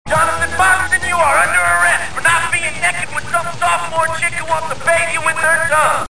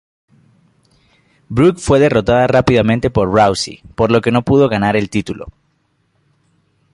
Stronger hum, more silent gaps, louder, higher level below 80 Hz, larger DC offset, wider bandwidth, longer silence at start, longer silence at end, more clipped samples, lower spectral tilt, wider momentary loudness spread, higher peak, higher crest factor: neither; neither; about the same, -14 LUFS vs -14 LUFS; about the same, -40 dBFS vs -38 dBFS; first, 5% vs under 0.1%; about the same, 10.5 kHz vs 11.5 kHz; second, 0.05 s vs 1.5 s; second, 0 s vs 1.45 s; neither; second, -2 dB/octave vs -6.5 dB/octave; second, 6 LU vs 10 LU; about the same, -2 dBFS vs 0 dBFS; about the same, 14 dB vs 14 dB